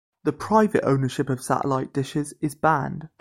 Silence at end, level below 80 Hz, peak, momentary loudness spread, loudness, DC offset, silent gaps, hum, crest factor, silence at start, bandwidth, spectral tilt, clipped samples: 0.15 s; -56 dBFS; -6 dBFS; 9 LU; -24 LUFS; under 0.1%; none; none; 18 dB; 0.25 s; 16 kHz; -6.5 dB/octave; under 0.1%